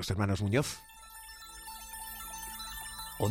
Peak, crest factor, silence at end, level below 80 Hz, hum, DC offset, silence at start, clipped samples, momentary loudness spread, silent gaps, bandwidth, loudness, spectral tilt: -16 dBFS; 20 dB; 0 s; -54 dBFS; none; under 0.1%; 0 s; under 0.1%; 16 LU; none; 16.5 kHz; -36 LUFS; -5 dB/octave